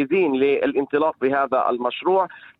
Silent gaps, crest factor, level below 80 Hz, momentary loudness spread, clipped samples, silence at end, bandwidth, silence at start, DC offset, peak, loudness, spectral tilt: none; 14 dB; -64 dBFS; 3 LU; under 0.1%; 0.2 s; 4.6 kHz; 0 s; under 0.1%; -8 dBFS; -21 LUFS; -8.5 dB/octave